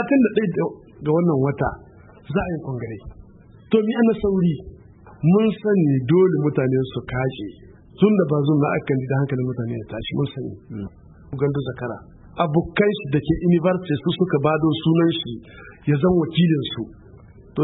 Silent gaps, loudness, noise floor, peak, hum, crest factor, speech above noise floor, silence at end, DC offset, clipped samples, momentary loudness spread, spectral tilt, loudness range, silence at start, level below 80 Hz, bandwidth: none; -21 LUFS; -46 dBFS; -4 dBFS; none; 18 dB; 26 dB; 0 s; under 0.1%; under 0.1%; 15 LU; -12.5 dB/octave; 5 LU; 0 s; -46 dBFS; 4.1 kHz